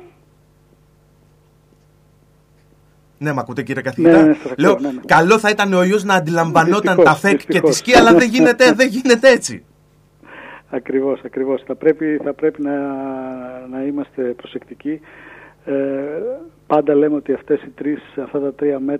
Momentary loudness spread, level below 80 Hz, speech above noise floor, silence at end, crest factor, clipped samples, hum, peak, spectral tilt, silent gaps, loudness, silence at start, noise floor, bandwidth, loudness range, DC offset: 16 LU; -50 dBFS; 37 dB; 0 s; 16 dB; under 0.1%; 50 Hz at -50 dBFS; 0 dBFS; -5 dB/octave; none; -15 LUFS; 3.2 s; -53 dBFS; 15 kHz; 13 LU; under 0.1%